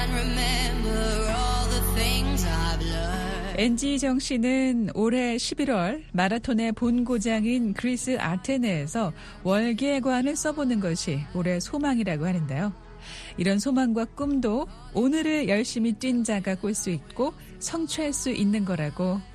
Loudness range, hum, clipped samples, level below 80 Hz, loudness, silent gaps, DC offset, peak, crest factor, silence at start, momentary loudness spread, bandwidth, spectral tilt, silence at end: 2 LU; none; under 0.1%; -34 dBFS; -26 LUFS; none; under 0.1%; -8 dBFS; 18 dB; 0 s; 6 LU; 13 kHz; -5 dB/octave; 0 s